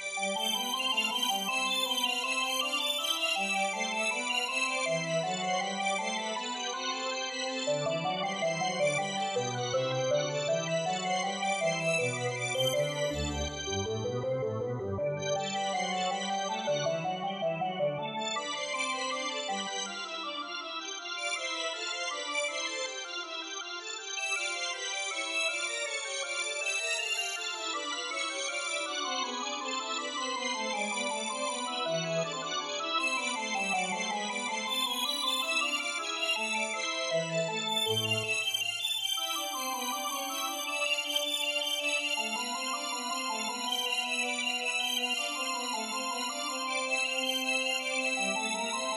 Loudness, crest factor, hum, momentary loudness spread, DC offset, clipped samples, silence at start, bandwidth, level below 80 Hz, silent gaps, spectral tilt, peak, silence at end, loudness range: -31 LUFS; 16 dB; none; 5 LU; under 0.1%; under 0.1%; 0 s; 14.5 kHz; -60 dBFS; none; -2 dB/octave; -16 dBFS; 0 s; 4 LU